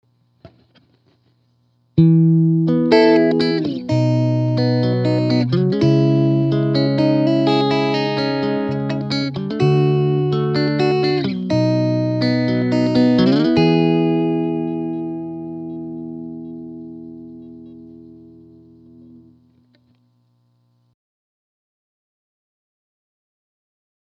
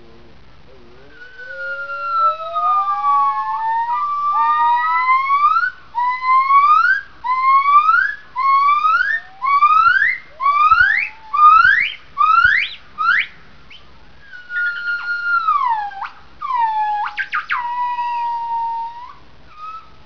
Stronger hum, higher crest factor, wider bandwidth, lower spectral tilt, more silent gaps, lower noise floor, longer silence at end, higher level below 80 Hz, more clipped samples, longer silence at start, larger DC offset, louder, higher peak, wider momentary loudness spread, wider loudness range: first, 60 Hz at -50 dBFS vs none; about the same, 18 dB vs 16 dB; first, 7.8 kHz vs 5.4 kHz; first, -8.5 dB/octave vs -2 dB/octave; neither; first, -61 dBFS vs -46 dBFS; first, 5.9 s vs 0.25 s; about the same, -56 dBFS vs -52 dBFS; neither; second, 0.45 s vs 1.2 s; second, under 0.1% vs 1%; about the same, -17 LUFS vs -15 LUFS; about the same, 0 dBFS vs -2 dBFS; about the same, 16 LU vs 14 LU; first, 14 LU vs 8 LU